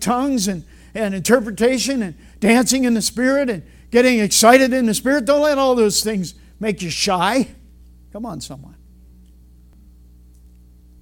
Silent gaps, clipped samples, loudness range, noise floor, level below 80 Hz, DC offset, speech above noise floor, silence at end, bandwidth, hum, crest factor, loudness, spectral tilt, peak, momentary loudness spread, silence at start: none; under 0.1%; 12 LU; -46 dBFS; -46 dBFS; under 0.1%; 29 dB; 2.4 s; 18.5 kHz; 60 Hz at -45 dBFS; 18 dB; -17 LUFS; -3.5 dB/octave; 0 dBFS; 17 LU; 0 s